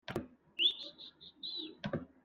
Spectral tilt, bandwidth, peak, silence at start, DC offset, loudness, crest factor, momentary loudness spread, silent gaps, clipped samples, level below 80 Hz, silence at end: -5 dB/octave; 15.5 kHz; -20 dBFS; 0.1 s; under 0.1%; -36 LUFS; 20 dB; 17 LU; none; under 0.1%; -70 dBFS; 0.15 s